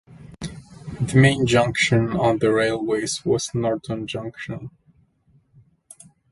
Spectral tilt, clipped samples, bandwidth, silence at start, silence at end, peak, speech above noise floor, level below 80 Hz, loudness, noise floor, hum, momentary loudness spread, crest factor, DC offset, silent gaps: -5.5 dB/octave; under 0.1%; 11.5 kHz; 0.1 s; 1.6 s; -2 dBFS; 40 dB; -50 dBFS; -21 LUFS; -60 dBFS; none; 19 LU; 20 dB; under 0.1%; none